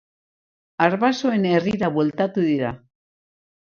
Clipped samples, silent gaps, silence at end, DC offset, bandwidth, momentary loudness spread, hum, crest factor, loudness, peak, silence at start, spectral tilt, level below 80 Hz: under 0.1%; none; 1 s; under 0.1%; 7.4 kHz; 9 LU; none; 20 dB; -21 LUFS; -2 dBFS; 0.8 s; -6.5 dB/octave; -58 dBFS